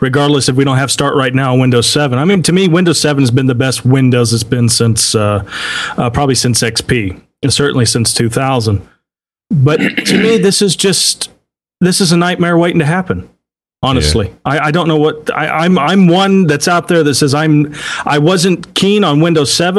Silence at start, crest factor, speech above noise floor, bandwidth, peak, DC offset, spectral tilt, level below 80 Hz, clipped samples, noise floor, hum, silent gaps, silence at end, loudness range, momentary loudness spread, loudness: 0 s; 12 dB; 69 dB; 13 kHz; 0 dBFS; under 0.1%; -4.5 dB/octave; -36 dBFS; under 0.1%; -80 dBFS; none; none; 0 s; 3 LU; 6 LU; -11 LUFS